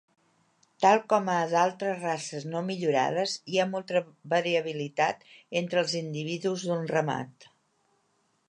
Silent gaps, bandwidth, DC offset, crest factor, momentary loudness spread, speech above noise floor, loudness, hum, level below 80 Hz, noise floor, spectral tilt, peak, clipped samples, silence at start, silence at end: none; 11 kHz; under 0.1%; 22 dB; 9 LU; 44 dB; -28 LUFS; none; -80 dBFS; -72 dBFS; -4.5 dB/octave; -8 dBFS; under 0.1%; 0.8 s; 1.2 s